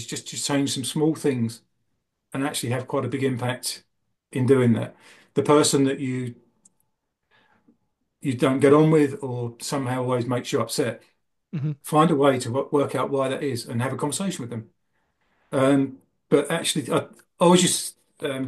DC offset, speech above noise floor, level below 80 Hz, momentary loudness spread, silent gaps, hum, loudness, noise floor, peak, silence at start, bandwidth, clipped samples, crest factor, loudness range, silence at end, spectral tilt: under 0.1%; 54 dB; -68 dBFS; 13 LU; none; none; -23 LUFS; -76 dBFS; -4 dBFS; 0 s; 12.5 kHz; under 0.1%; 20 dB; 4 LU; 0 s; -5 dB/octave